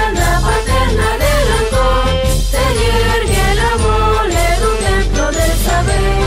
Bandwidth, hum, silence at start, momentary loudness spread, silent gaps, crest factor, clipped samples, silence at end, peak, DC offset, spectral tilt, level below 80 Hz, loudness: 16 kHz; none; 0 s; 2 LU; none; 10 dB; under 0.1%; 0 s; -2 dBFS; under 0.1%; -4.5 dB/octave; -16 dBFS; -14 LUFS